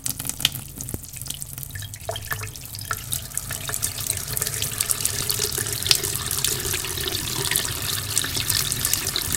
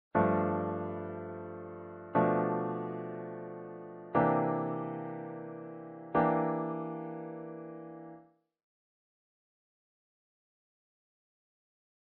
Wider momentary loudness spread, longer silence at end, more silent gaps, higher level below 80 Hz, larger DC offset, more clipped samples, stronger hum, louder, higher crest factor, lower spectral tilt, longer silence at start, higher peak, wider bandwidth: second, 11 LU vs 17 LU; second, 0 s vs 3.95 s; neither; first, -44 dBFS vs -70 dBFS; first, 0.1% vs under 0.1%; neither; neither; first, -24 LUFS vs -34 LUFS; about the same, 26 dB vs 22 dB; second, -1.5 dB/octave vs -8 dB/octave; second, 0 s vs 0.15 s; first, 0 dBFS vs -14 dBFS; first, 17 kHz vs 4.2 kHz